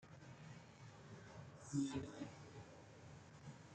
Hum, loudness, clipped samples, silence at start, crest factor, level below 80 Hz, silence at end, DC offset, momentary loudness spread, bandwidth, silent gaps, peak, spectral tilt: none; -52 LUFS; under 0.1%; 0 s; 22 dB; -76 dBFS; 0 s; under 0.1%; 16 LU; 9 kHz; none; -30 dBFS; -5.5 dB/octave